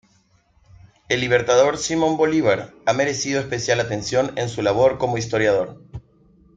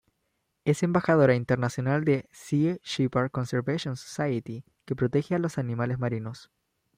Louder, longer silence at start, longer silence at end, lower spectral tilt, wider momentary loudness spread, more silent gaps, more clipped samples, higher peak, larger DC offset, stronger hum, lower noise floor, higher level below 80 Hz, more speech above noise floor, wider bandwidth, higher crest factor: first, -20 LUFS vs -27 LUFS; first, 1.1 s vs 0.65 s; about the same, 0.55 s vs 0.55 s; second, -4.5 dB/octave vs -7 dB/octave; second, 7 LU vs 12 LU; neither; neither; first, -2 dBFS vs -8 dBFS; neither; neither; second, -60 dBFS vs -77 dBFS; first, -52 dBFS vs -62 dBFS; second, 40 dB vs 51 dB; second, 9.2 kHz vs 15 kHz; about the same, 18 dB vs 18 dB